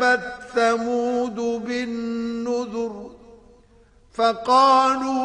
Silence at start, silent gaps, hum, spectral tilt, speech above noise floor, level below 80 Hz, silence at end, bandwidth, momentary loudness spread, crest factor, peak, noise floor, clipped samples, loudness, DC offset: 0 s; none; none; -3.5 dB/octave; 34 dB; -58 dBFS; 0 s; 10.5 kHz; 13 LU; 18 dB; -4 dBFS; -54 dBFS; under 0.1%; -21 LUFS; under 0.1%